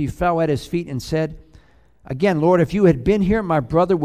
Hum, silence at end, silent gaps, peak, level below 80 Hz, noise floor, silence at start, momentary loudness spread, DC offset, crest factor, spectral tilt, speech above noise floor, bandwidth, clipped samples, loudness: none; 0 s; none; -2 dBFS; -38 dBFS; -51 dBFS; 0 s; 9 LU; 0.2%; 16 dB; -7.5 dB/octave; 33 dB; 14.5 kHz; under 0.1%; -19 LUFS